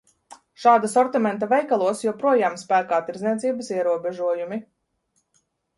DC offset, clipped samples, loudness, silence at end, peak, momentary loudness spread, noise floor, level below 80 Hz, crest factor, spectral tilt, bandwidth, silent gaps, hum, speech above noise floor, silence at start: under 0.1%; under 0.1%; -22 LUFS; 1.15 s; -4 dBFS; 8 LU; -71 dBFS; -72 dBFS; 18 dB; -5 dB/octave; 11.5 kHz; none; none; 50 dB; 0.3 s